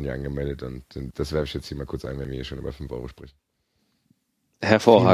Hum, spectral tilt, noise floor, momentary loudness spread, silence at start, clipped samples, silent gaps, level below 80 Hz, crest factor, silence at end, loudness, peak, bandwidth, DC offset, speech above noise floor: none; -6.5 dB/octave; -71 dBFS; 17 LU; 0 s; under 0.1%; none; -42 dBFS; 24 dB; 0 s; -26 LUFS; -2 dBFS; 15 kHz; under 0.1%; 48 dB